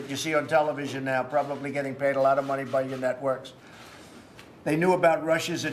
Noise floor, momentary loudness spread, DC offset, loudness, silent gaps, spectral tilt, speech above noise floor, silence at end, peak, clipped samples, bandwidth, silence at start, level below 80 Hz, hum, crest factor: -48 dBFS; 12 LU; under 0.1%; -26 LUFS; none; -5 dB/octave; 22 dB; 0 s; -10 dBFS; under 0.1%; 14.5 kHz; 0 s; -70 dBFS; none; 18 dB